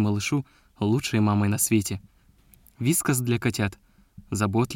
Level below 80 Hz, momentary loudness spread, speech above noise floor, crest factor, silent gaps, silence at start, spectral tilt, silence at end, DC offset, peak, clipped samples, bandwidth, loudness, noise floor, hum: -56 dBFS; 9 LU; 33 dB; 16 dB; none; 0 s; -5 dB/octave; 0 s; under 0.1%; -10 dBFS; under 0.1%; 17 kHz; -25 LUFS; -57 dBFS; none